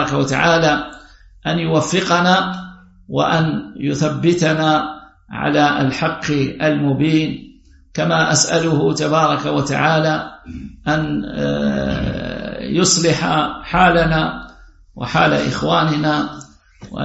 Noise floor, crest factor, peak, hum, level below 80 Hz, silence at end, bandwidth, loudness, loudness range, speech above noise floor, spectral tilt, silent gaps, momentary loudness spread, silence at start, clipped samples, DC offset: -43 dBFS; 18 dB; 0 dBFS; none; -40 dBFS; 0 s; 8.2 kHz; -17 LUFS; 2 LU; 27 dB; -4.5 dB/octave; none; 13 LU; 0 s; under 0.1%; under 0.1%